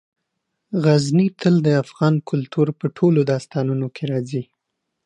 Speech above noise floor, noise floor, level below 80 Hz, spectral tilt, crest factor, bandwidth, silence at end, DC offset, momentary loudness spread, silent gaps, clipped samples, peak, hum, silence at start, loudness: 59 dB; -78 dBFS; -64 dBFS; -7.5 dB/octave; 16 dB; 10.5 kHz; 0.65 s; under 0.1%; 8 LU; none; under 0.1%; -4 dBFS; none; 0.7 s; -20 LUFS